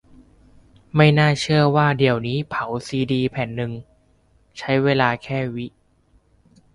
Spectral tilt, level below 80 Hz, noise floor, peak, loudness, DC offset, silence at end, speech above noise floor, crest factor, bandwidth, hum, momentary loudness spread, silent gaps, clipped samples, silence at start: -6.5 dB/octave; -52 dBFS; -59 dBFS; -2 dBFS; -20 LUFS; under 0.1%; 1.05 s; 39 dB; 20 dB; 11 kHz; none; 15 LU; none; under 0.1%; 0.95 s